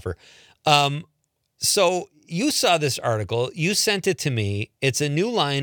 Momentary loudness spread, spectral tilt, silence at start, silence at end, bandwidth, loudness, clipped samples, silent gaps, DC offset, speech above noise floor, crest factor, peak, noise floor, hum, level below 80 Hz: 9 LU; -3.5 dB/octave; 0.05 s; 0 s; 19.5 kHz; -22 LUFS; under 0.1%; none; under 0.1%; 35 dB; 22 dB; -2 dBFS; -57 dBFS; none; -60 dBFS